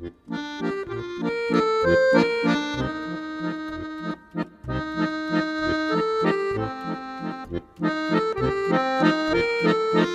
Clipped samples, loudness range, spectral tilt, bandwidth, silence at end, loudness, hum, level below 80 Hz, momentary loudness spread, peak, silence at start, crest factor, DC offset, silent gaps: under 0.1%; 4 LU; -6.5 dB/octave; 10.5 kHz; 0 s; -24 LUFS; none; -48 dBFS; 12 LU; -4 dBFS; 0 s; 20 dB; under 0.1%; none